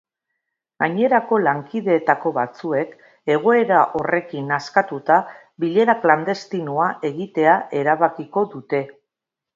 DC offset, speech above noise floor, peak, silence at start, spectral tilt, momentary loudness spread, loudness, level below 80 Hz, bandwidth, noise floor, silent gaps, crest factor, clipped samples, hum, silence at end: under 0.1%; 66 dB; 0 dBFS; 0.8 s; -7 dB/octave; 8 LU; -19 LUFS; -68 dBFS; 7.6 kHz; -85 dBFS; none; 20 dB; under 0.1%; none; 0.65 s